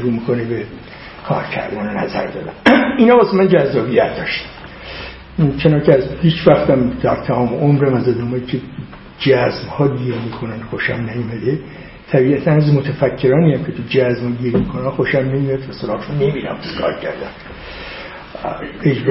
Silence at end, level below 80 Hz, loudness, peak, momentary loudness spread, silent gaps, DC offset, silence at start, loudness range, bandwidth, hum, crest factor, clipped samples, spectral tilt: 0 s; -40 dBFS; -16 LUFS; 0 dBFS; 17 LU; none; under 0.1%; 0 s; 5 LU; 5.8 kHz; none; 16 dB; under 0.1%; -9.5 dB/octave